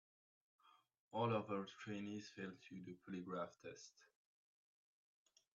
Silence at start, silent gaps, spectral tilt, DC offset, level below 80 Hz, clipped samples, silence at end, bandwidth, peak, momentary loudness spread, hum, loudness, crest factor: 0.65 s; 1.00-1.11 s; -5.5 dB/octave; under 0.1%; -90 dBFS; under 0.1%; 1.5 s; 7.6 kHz; -30 dBFS; 15 LU; none; -48 LUFS; 22 dB